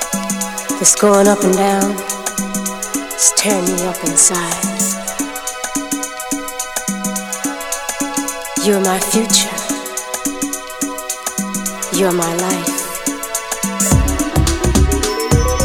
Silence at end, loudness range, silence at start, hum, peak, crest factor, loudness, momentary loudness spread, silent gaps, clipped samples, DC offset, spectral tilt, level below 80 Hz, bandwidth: 0 s; 6 LU; 0 s; none; 0 dBFS; 16 dB; -16 LUFS; 10 LU; none; under 0.1%; under 0.1%; -3.5 dB/octave; -28 dBFS; over 20 kHz